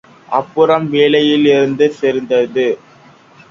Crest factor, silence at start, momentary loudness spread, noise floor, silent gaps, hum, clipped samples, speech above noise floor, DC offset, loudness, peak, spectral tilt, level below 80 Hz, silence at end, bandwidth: 14 dB; 0.3 s; 8 LU; -44 dBFS; none; none; under 0.1%; 31 dB; under 0.1%; -13 LUFS; 0 dBFS; -6 dB/octave; -58 dBFS; 0.75 s; 7.4 kHz